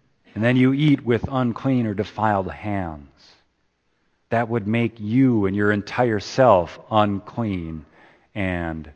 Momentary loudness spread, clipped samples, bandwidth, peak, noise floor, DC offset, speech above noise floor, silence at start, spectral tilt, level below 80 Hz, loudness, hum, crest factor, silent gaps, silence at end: 11 LU; under 0.1%; 8.2 kHz; -2 dBFS; -69 dBFS; under 0.1%; 48 dB; 0.35 s; -7.5 dB/octave; -50 dBFS; -21 LUFS; none; 20 dB; none; 0.05 s